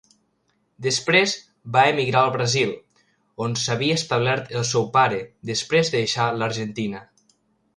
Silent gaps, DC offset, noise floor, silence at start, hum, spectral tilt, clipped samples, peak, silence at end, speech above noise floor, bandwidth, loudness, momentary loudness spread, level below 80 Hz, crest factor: none; under 0.1%; -69 dBFS; 0.8 s; none; -4 dB/octave; under 0.1%; -2 dBFS; 0.75 s; 47 dB; 11.5 kHz; -21 LUFS; 11 LU; -60 dBFS; 20 dB